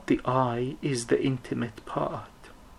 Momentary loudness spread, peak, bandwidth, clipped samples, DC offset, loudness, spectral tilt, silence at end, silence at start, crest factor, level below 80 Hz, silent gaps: 7 LU; -10 dBFS; 12.5 kHz; under 0.1%; under 0.1%; -29 LUFS; -6 dB/octave; 0.05 s; 0 s; 20 dB; -54 dBFS; none